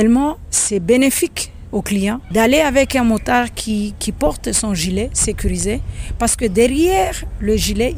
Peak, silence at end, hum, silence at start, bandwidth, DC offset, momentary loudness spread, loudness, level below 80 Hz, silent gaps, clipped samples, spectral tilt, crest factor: -2 dBFS; 0 s; none; 0 s; 17 kHz; under 0.1%; 8 LU; -17 LUFS; -28 dBFS; none; under 0.1%; -4 dB/octave; 14 dB